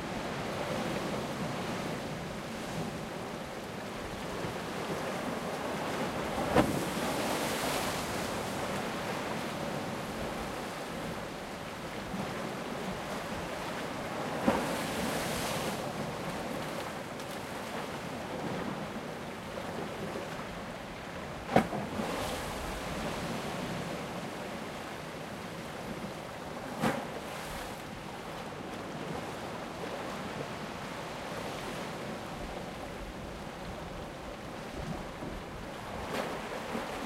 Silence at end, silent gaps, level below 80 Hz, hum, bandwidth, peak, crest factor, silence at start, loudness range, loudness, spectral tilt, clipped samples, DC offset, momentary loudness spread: 0 s; none; -54 dBFS; none; 16 kHz; -8 dBFS; 28 dB; 0 s; 7 LU; -37 LUFS; -4.5 dB/octave; under 0.1%; under 0.1%; 9 LU